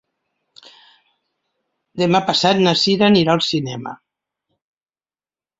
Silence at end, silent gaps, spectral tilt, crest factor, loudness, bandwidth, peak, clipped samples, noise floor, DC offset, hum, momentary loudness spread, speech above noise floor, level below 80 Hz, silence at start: 1.65 s; none; -5 dB/octave; 18 dB; -16 LUFS; 7.8 kHz; -2 dBFS; under 0.1%; under -90 dBFS; under 0.1%; none; 16 LU; over 74 dB; -58 dBFS; 1.95 s